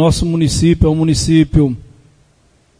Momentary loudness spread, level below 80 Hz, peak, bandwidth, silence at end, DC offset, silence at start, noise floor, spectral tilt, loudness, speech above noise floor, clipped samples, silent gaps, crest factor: 4 LU; -26 dBFS; 0 dBFS; 11 kHz; 1 s; under 0.1%; 0 s; -53 dBFS; -6 dB/octave; -13 LUFS; 41 dB; under 0.1%; none; 14 dB